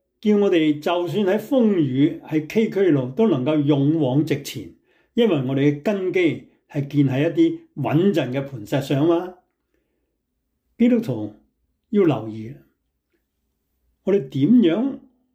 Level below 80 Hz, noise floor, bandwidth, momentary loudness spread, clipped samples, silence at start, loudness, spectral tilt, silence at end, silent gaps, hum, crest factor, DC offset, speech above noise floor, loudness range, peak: -64 dBFS; -74 dBFS; 16 kHz; 11 LU; under 0.1%; 0.25 s; -20 LUFS; -7.5 dB/octave; 0.35 s; none; none; 14 dB; under 0.1%; 55 dB; 5 LU; -6 dBFS